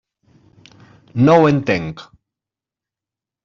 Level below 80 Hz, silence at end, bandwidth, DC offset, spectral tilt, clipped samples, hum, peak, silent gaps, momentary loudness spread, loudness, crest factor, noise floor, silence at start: -54 dBFS; 1.4 s; 7.4 kHz; under 0.1%; -6.5 dB/octave; under 0.1%; none; -2 dBFS; none; 19 LU; -14 LUFS; 18 dB; -88 dBFS; 1.15 s